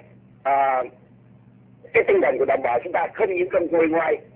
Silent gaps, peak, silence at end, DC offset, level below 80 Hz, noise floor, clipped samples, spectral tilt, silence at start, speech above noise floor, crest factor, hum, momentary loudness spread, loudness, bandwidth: none; -6 dBFS; 0.15 s; under 0.1%; -60 dBFS; -50 dBFS; under 0.1%; -9 dB/octave; 0.45 s; 30 dB; 18 dB; none; 6 LU; -21 LUFS; 4 kHz